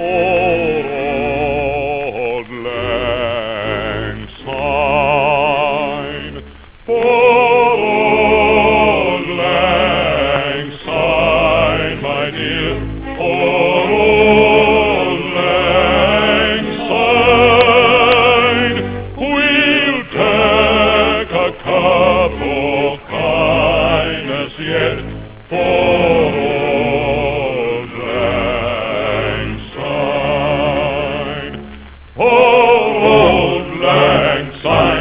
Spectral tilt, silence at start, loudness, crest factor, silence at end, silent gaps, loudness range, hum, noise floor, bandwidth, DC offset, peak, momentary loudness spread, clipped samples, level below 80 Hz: -9 dB/octave; 0 s; -13 LUFS; 14 dB; 0 s; none; 7 LU; none; -35 dBFS; 4 kHz; under 0.1%; 0 dBFS; 12 LU; under 0.1%; -32 dBFS